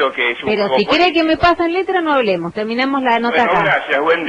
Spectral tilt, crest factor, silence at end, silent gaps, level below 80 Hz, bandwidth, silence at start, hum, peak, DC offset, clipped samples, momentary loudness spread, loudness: -5.5 dB/octave; 12 dB; 0 s; none; -44 dBFS; 9.6 kHz; 0 s; none; -2 dBFS; under 0.1%; under 0.1%; 5 LU; -15 LUFS